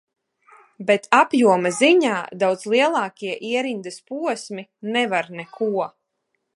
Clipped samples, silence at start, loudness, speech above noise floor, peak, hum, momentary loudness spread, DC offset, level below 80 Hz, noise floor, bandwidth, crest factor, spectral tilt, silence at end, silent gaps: under 0.1%; 0.8 s; -20 LUFS; 55 dB; 0 dBFS; none; 15 LU; under 0.1%; -76 dBFS; -75 dBFS; 11.5 kHz; 22 dB; -4 dB/octave; 0.65 s; none